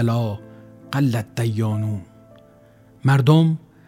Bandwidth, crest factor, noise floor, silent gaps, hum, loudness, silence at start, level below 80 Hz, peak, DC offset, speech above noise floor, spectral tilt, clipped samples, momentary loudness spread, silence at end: 15.5 kHz; 18 dB; -50 dBFS; none; none; -20 LUFS; 0 s; -60 dBFS; -2 dBFS; under 0.1%; 32 dB; -7.5 dB/octave; under 0.1%; 13 LU; 0.3 s